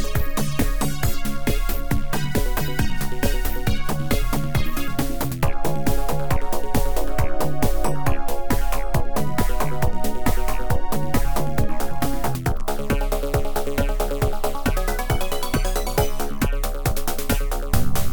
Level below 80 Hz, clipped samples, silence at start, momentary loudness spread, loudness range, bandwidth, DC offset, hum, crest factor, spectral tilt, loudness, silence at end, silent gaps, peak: -24 dBFS; under 0.1%; 0 s; 2 LU; 1 LU; 19.5 kHz; 7%; none; 16 dB; -5 dB/octave; -25 LUFS; 0 s; none; -4 dBFS